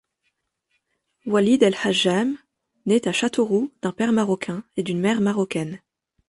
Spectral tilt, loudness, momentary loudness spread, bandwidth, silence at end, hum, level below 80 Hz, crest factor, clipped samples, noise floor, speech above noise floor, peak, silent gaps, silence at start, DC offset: -5 dB/octave; -22 LUFS; 11 LU; 11.5 kHz; 0.5 s; none; -64 dBFS; 18 dB; under 0.1%; -74 dBFS; 53 dB; -4 dBFS; none; 1.25 s; under 0.1%